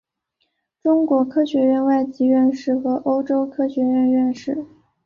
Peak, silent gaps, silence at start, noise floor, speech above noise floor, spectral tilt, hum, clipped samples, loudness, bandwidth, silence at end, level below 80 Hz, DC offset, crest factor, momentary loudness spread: -8 dBFS; none; 0.85 s; -72 dBFS; 54 dB; -7 dB/octave; none; under 0.1%; -19 LUFS; 7 kHz; 0.4 s; -64 dBFS; under 0.1%; 12 dB; 6 LU